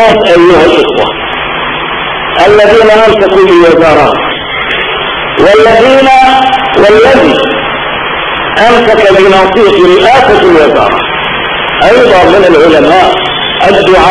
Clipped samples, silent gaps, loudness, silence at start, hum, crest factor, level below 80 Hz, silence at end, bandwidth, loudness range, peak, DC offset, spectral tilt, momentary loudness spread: 10%; none; -5 LUFS; 0 s; none; 4 dB; -30 dBFS; 0 s; 11 kHz; 1 LU; 0 dBFS; under 0.1%; -5 dB/octave; 8 LU